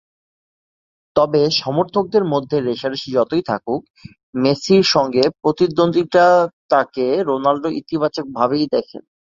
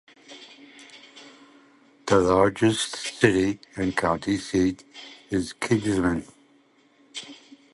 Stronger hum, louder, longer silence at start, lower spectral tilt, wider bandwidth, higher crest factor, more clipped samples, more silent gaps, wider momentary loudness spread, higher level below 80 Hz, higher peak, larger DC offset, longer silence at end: neither; first, -17 LUFS vs -24 LUFS; first, 1.15 s vs 0.3 s; about the same, -5.5 dB/octave vs -5 dB/octave; second, 7.6 kHz vs 11.5 kHz; second, 16 dB vs 22 dB; neither; first, 3.90-3.94 s, 4.23-4.33 s, 6.53-6.69 s vs none; second, 9 LU vs 24 LU; second, -56 dBFS vs -50 dBFS; about the same, -2 dBFS vs -4 dBFS; neither; about the same, 0.4 s vs 0.4 s